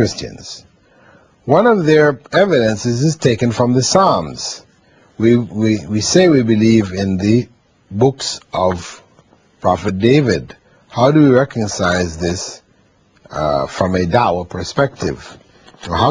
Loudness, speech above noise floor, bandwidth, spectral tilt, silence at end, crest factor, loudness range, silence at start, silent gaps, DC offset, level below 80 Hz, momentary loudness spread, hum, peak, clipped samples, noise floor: -15 LUFS; 40 dB; 10.5 kHz; -5.5 dB/octave; 0 s; 16 dB; 5 LU; 0 s; none; under 0.1%; -46 dBFS; 16 LU; none; 0 dBFS; under 0.1%; -54 dBFS